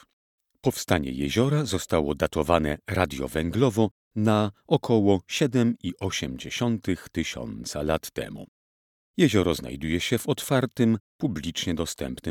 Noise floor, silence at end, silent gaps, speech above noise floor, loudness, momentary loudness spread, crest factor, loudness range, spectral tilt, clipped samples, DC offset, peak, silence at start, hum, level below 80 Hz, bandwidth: under -90 dBFS; 0 s; 3.91-4.11 s, 8.48-9.14 s, 11.00-11.19 s; over 65 dB; -26 LUFS; 8 LU; 22 dB; 4 LU; -5.5 dB/octave; under 0.1%; under 0.1%; -4 dBFS; 0.65 s; none; -46 dBFS; 18 kHz